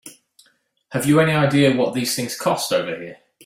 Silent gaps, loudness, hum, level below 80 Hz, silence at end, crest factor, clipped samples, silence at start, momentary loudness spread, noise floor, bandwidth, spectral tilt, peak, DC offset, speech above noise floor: none; -19 LUFS; none; -58 dBFS; 0.3 s; 16 dB; under 0.1%; 0.05 s; 13 LU; -61 dBFS; 16 kHz; -5 dB/octave; -4 dBFS; under 0.1%; 43 dB